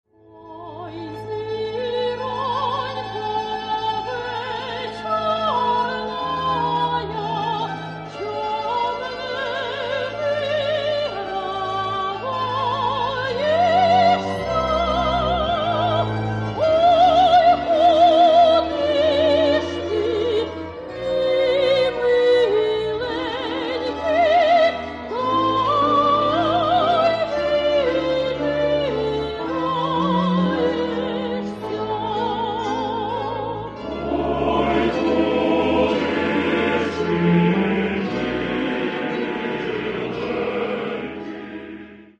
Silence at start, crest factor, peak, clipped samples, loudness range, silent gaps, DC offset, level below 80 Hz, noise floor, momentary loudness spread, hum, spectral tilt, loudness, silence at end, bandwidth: 0.35 s; 14 dB; -6 dBFS; under 0.1%; 8 LU; none; under 0.1%; -44 dBFS; -43 dBFS; 11 LU; none; -6.5 dB/octave; -20 LUFS; 0.15 s; 8.8 kHz